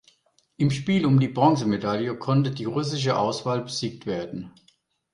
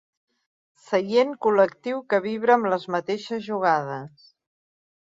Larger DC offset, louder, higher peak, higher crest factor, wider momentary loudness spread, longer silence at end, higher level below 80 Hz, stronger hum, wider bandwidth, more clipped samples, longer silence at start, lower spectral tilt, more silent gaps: neither; about the same, -24 LUFS vs -23 LUFS; about the same, -6 dBFS vs -4 dBFS; about the same, 20 dB vs 20 dB; about the same, 11 LU vs 10 LU; second, 0.65 s vs 1 s; first, -60 dBFS vs -72 dBFS; neither; first, 11 kHz vs 7.8 kHz; neither; second, 0.6 s vs 0.9 s; about the same, -6.5 dB/octave vs -6 dB/octave; neither